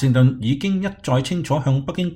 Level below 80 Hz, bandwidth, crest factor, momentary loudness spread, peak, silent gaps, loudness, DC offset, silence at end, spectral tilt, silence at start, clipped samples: -48 dBFS; 10.5 kHz; 14 dB; 5 LU; -4 dBFS; none; -20 LUFS; under 0.1%; 0 s; -7 dB/octave; 0 s; under 0.1%